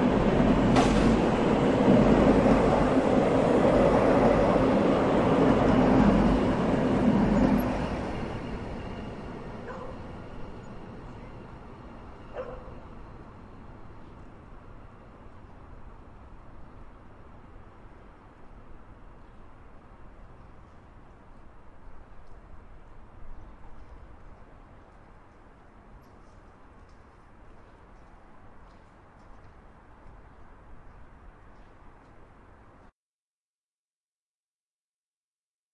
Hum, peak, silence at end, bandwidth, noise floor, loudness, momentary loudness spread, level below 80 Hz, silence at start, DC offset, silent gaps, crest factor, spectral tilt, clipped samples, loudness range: none; -8 dBFS; 4.45 s; 12 kHz; under -90 dBFS; -23 LUFS; 25 LU; -42 dBFS; 0 s; under 0.1%; none; 20 dB; -7.5 dB/octave; under 0.1%; 23 LU